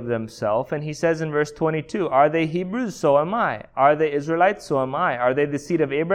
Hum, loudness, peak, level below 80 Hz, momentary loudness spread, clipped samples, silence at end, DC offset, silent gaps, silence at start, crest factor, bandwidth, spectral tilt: none; -22 LUFS; -4 dBFS; -56 dBFS; 7 LU; under 0.1%; 0 s; under 0.1%; none; 0 s; 18 dB; 13.5 kHz; -6.5 dB/octave